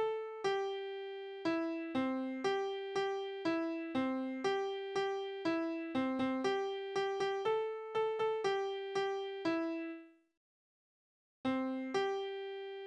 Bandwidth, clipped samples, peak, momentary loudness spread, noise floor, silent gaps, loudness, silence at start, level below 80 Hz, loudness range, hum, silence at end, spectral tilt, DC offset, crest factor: 9.8 kHz; under 0.1%; -22 dBFS; 5 LU; under -90 dBFS; 10.37-11.44 s; -37 LUFS; 0 s; -78 dBFS; 4 LU; none; 0 s; -4.5 dB/octave; under 0.1%; 16 dB